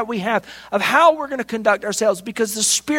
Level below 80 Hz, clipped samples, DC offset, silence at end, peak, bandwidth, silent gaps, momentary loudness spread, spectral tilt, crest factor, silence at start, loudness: -60 dBFS; under 0.1%; under 0.1%; 0 s; 0 dBFS; 16.5 kHz; none; 10 LU; -2 dB/octave; 18 dB; 0 s; -18 LUFS